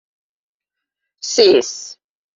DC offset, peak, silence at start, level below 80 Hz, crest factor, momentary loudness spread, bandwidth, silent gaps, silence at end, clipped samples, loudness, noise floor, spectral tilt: under 0.1%; 0 dBFS; 1.25 s; -66 dBFS; 18 dB; 19 LU; 7.6 kHz; none; 0.45 s; under 0.1%; -14 LUFS; -84 dBFS; -2 dB/octave